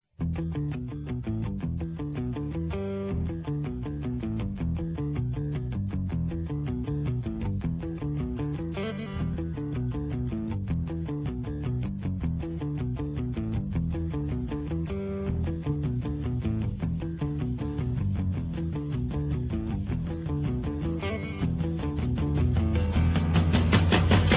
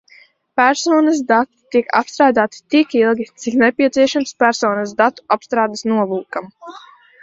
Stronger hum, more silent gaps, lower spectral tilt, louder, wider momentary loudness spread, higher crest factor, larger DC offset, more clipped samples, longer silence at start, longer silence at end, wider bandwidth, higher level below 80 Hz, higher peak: neither; neither; first, -11.5 dB/octave vs -4 dB/octave; second, -30 LUFS vs -16 LUFS; about the same, 7 LU vs 9 LU; about the same, 20 dB vs 16 dB; neither; neither; second, 0.2 s vs 0.55 s; second, 0 s vs 0.45 s; second, 4 kHz vs 7.8 kHz; first, -36 dBFS vs -62 dBFS; second, -8 dBFS vs 0 dBFS